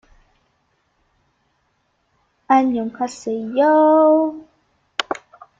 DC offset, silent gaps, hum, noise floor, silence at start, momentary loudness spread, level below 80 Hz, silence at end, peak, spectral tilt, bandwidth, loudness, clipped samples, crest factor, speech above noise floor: under 0.1%; none; none; -67 dBFS; 2.5 s; 15 LU; -64 dBFS; 0.45 s; 0 dBFS; -4.5 dB/octave; 7.8 kHz; -18 LUFS; under 0.1%; 20 dB; 51 dB